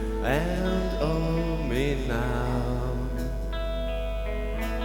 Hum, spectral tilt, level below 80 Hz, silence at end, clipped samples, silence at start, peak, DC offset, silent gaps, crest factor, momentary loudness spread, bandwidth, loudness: 50 Hz at -30 dBFS; -6.5 dB/octave; -30 dBFS; 0 s; under 0.1%; 0 s; -10 dBFS; under 0.1%; none; 18 dB; 6 LU; 17 kHz; -29 LUFS